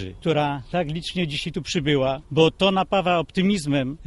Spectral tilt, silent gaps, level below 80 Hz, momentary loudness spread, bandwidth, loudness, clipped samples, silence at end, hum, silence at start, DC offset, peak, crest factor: -5.5 dB/octave; none; -46 dBFS; 7 LU; 11.5 kHz; -22 LUFS; under 0.1%; 0 s; none; 0 s; under 0.1%; -4 dBFS; 18 dB